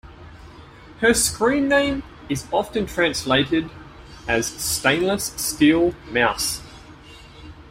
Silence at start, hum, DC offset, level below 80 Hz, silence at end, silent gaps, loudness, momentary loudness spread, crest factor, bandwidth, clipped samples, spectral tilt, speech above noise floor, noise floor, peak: 0.05 s; none; under 0.1%; -44 dBFS; 0 s; none; -20 LUFS; 9 LU; 18 dB; 16 kHz; under 0.1%; -3 dB/octave; 23 dB; -43 dBFS; -4 dBFS